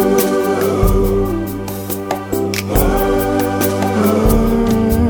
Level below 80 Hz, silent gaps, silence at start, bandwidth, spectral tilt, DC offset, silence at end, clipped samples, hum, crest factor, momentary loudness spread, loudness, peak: -22 dBFS; none; 0 s; over 20 kHz; -6 dB/octave; under 0.1%; 0 s; under 0.1%; none; 14 dB; 7 LU; -16 LUFS; 0 dBFS